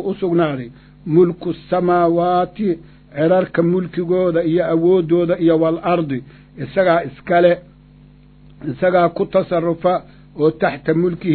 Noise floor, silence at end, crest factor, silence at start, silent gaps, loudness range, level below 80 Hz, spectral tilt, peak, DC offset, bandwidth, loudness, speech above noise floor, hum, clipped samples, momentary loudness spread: -45 dBFS; 0 s; 16 dB; 0 s; none; 3 LU; -50 dBFS; -12 dB/octave; -2 dBFS; under 0.1%; 4.5 kHz; -17 LUFS; 29 dB; none; under 0.1%; 11 LU